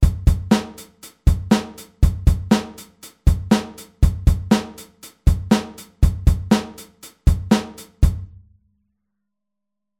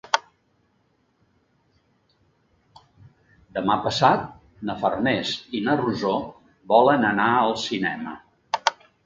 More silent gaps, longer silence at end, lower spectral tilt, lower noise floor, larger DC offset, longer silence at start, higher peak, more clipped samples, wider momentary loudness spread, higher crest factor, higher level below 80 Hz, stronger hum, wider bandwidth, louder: neither; first, 1.75 s vs 0.35 s; first, -6.5 dB/octave vs -4.5 dB/octave; first, -83 dBFS vs -67 dBFS; neither; second, 0 s vs 0.15 s; about the same, -2 dBFS vs 0 dBFS; neither; first, 21 LU vs 15 LU; second, 18 dB vs 24 dB; first, -24 dBFS vs -58 dBFS; neither; first, 16 kHz vs 7.8 kHz; first, -20 LUFS vs -23 LUFS